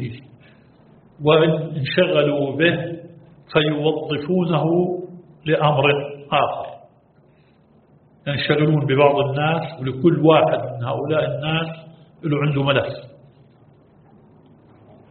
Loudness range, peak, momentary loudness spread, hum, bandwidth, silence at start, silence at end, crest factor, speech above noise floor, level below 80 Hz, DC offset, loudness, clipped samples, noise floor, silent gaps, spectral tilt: 5 LU; 0 dBFS; 15 LU; none; 4.5 kHz; 0 s; 2 s; 20 dB; 36 dB; -56 dBFS; under 0.1%; -19 LUFS; under 0.1%; -54 dBFS; none; -5 dB/octave